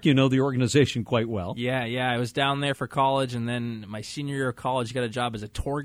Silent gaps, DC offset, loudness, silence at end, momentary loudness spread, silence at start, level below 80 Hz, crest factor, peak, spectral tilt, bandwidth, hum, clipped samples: none; under 0.1%; -26 LUFS; 0 s; 10 LU; 0 s; -50 dBFS; 18 dB; -6 dBFS; -5.5 dB/octave; 14.5 kHz; none; under 0.1%